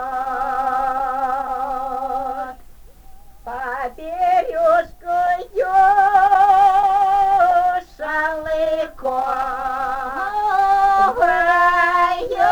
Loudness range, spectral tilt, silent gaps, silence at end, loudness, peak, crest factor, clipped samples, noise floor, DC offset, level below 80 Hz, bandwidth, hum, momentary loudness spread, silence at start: 9 LU; -4 dB/octave; none; 0 s; -18 LUFS; -2 dBFS; 14 dB; under 0.1%; -41 dBFS; under 0.1%; -44 dBFS; 20 kHz; none; 11 LU; 0 s